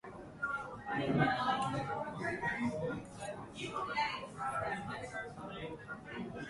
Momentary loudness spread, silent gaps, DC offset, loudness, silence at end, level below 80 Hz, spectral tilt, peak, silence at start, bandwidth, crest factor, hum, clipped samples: 13 LU; none; under 0.1%; -38 LUFS; 0 s; -64 dBFS; -5.5 dB/octave; -18 dBFS; 0.05 s; 11.5 kHz; 20 dB; none; under 0.1%